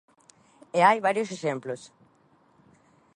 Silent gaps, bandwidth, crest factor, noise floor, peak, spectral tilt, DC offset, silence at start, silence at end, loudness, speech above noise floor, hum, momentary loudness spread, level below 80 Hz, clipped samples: none; 11.5 kHz; 22 dB; -62 dBFS; -6 dBFS; -5 dB/octave; under 0.1%; 0.75 s; 1.3 s; -25 LUFS; 38 dB; none; 16 LU; -80 dBFS; under 0.1%